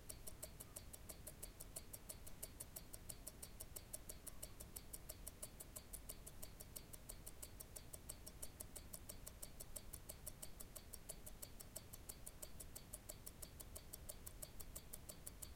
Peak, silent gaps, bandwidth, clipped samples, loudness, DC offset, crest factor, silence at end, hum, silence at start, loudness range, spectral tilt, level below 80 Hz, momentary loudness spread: -30 dBFS; none; 17 kHz; under 0.1%; -55 LUFS; under 0.1%; 26 dB; 0 s; none; 0 s; 1 LU; -3 dB/octave; -62 dBFS; 3 LU